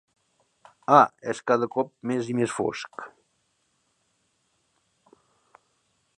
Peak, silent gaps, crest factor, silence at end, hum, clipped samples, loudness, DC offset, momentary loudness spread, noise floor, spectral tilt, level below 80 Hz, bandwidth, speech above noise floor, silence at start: -2 dBFS; none; 26 dB; 3.1 s; none; under 0.1%; -24 LUFS; under 0.1%; 20 LU; -72 dBFS; -5.5 dB/octave; -72 dBFS; 11.5 kHz; 48 dB; 0.9 s